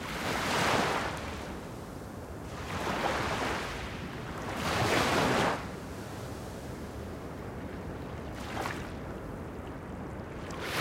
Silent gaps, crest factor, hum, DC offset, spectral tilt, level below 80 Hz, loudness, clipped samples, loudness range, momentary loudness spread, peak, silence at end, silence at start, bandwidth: none; 20 dB; none; under 0.1%; -4.5 dB/octave; -48 dBFS; -34 LUFS; under 0.1%; 9 LU; 14 LU; -14 dBFS; 0 s; 0 s; 16 kHz